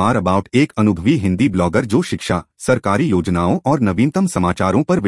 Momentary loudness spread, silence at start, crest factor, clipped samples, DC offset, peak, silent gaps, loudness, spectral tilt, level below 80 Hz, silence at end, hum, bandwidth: 3 LU; 0 s; 14 dB; under 0.1%; under 0.1%; -2 dBFS; none; -17 LUFS; -6.5 dB/octave; -44 dBFS; 0 s; none; 12 kHz